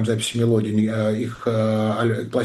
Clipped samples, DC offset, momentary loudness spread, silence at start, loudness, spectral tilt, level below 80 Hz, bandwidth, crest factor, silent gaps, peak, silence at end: under 0.1%; under 0.1%; 4 LU; 0 s; -21 LUFS; -6 dB/octave; -58 dBFS; 12.5 kHz; 12 dB; none; -8 dBFS; 0 s